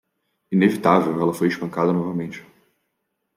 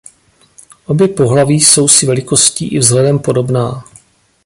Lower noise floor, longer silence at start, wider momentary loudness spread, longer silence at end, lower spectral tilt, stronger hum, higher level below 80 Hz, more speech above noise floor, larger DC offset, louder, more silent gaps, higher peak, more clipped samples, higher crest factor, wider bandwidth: first, -76 dBFS vs -49 dBFS; second, 0.5 s vs 0.9 s; about the same, 11 LU vs 10 LU; first, 0.95 s vs 0.65 s; first, -7.5 dB/octave vs -4 dB/octave; neither; second, -66 dBFS vs -48 dBFS; first, 56 dB vs 39 dB; neither; second, -21 LUFS vs -10 LUFS; neither; about the same, -2 dBFS vs 0 dBFS; second, under 0.1% vs 0.2%; first, 20 dB vs 12 dB; about the same, 16 kHz vs 16 kHz